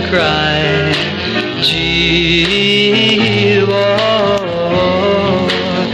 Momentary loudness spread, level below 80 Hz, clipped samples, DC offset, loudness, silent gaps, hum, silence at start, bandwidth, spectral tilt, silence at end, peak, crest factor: 5 LU; -34 dBFS; under 0.1%; under 0.1%; -12 LUFS; none; none; 0 s; 12.5 kHz; -5 dB/octave; 0 s; 0 dBFS; 12 dB